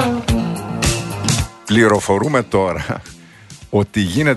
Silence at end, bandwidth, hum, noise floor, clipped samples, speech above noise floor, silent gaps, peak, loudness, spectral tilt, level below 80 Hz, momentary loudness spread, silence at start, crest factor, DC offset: 0 s; 12.5 kHz; none; -40 dBFS; under 0.1%; 24 dB; none; 0 dBFS; -17 LUFS; -5 dB/octave; -34 dBFS; 8 LU; 0 s; 18 dB; under 0.1%